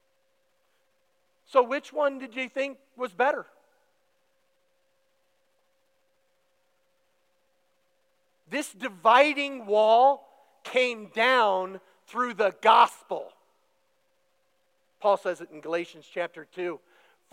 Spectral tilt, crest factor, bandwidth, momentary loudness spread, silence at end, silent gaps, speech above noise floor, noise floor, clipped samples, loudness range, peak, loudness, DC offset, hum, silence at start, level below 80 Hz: -3 dB/octave; 24 dB; 15.5 kHz; 17 LU; 0.55 s; none; 48 dB; -73 dBFS; under 0.1%; 11 LU; -4 dBFS; -25 LUFS; under 0.1%; none; 1.55 s; under -90 dBFS